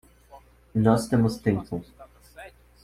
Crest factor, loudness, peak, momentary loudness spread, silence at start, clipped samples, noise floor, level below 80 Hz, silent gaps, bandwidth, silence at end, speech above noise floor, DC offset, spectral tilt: 20 dB; -25 LUFS; -6 dBFS; 24 LU; 0.35 s; under 0.1%; -52 dBFS; -52 dBFS; none; 15 kHz; 0.35 s; 29 dB; under 0.1%; -7.5 dB/octave